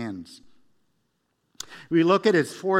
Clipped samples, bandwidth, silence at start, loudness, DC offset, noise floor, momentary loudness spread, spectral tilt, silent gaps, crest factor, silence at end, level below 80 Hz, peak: under 0.1%; 13.5 kHz; 0 s; -21 LUFS; under 0.1%; -73 dBFS; 21 LU; -5.5 dB/octave; none; 20 dB; 0 s; -70 dBFS; -6 dBFS